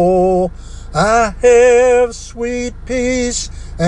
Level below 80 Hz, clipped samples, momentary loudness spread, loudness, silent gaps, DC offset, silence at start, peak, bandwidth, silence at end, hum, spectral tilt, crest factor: -30 dBFS; under 0.1%; 13 LU; -14 LUFS; none; under 0.1%; 0 s; -2 dBFS; 10.5 kHz; 0 s; none; -4.5 dB/octave; 12 dB